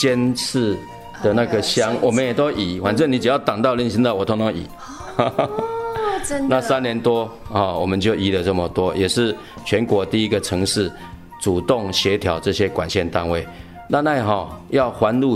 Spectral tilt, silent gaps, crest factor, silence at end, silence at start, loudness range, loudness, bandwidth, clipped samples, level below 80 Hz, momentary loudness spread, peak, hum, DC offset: -5 dB/octave; none; 18 dB; 0 s; 0 s; 2 LU; -20 LUFS; 15.5 kHz; under 0.1%; -44 dBFS; 7 LU; -2 dBFS; none; under 0.1%